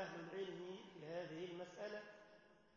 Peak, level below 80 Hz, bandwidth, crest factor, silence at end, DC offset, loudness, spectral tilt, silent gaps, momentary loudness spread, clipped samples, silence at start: -36 dBFS; -88 dBFS; 7 kHz; 16 dB; 0 s; under 0.1%; -51 LUFS; -4 dB/octave; none; 14 LU; under 0.1%; 0 s